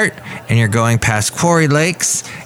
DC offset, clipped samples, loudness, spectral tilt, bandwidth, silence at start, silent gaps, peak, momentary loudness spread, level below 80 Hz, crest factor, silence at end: under 0.1%; under 0.1%; -14 LUFS; -4.5 dB/octave; 16.5 kHz; 0 s; none; 0 dBFS; 6 LU; -42 dBFS; 14 dB; 0 s